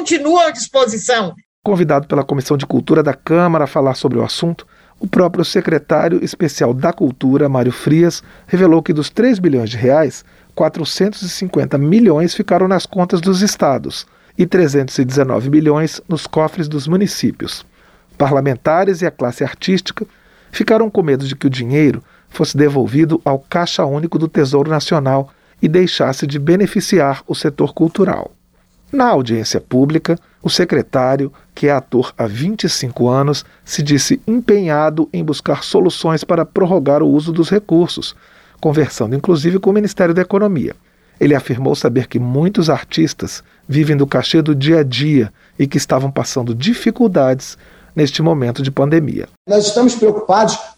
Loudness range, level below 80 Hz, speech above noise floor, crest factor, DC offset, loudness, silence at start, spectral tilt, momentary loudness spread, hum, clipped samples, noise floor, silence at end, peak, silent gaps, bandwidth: 2 LU; -50 dBFS; 39 dB; 12 dB; under 0.1%; -15 LUFS; 0 s; -6 dB/octave; 7 LU; none; under 0.1%; -53 dBFS; 0.05 s; -2 dBFS; 1.45-1.63 s, 49.37-49.45 s; 15.5 kHz